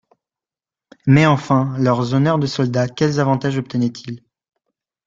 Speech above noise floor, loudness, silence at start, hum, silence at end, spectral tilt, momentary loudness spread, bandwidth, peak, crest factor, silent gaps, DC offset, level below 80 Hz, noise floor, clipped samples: over 73 dB; -17 LUFS; 1.05 s; none; 0.9 s; -7 dB/octave; 11 LU; 7.6 kHz; -2 dBFS; 16 dB; none; under 0.1%; -52 dBFS; under -90 dBFS; under 0.1%